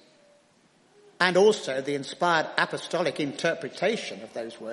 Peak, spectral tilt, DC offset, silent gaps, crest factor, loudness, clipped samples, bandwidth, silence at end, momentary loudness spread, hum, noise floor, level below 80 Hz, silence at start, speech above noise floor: -4 dBFS; -4 dB/octave; under 0.1%; none; 24 dB; -26 LUFS; under 0.1%; 11.5 kHz; 0 s; 13 LU; none; -62 dBFS; -76 dBFS; 1.2 s; 36 dB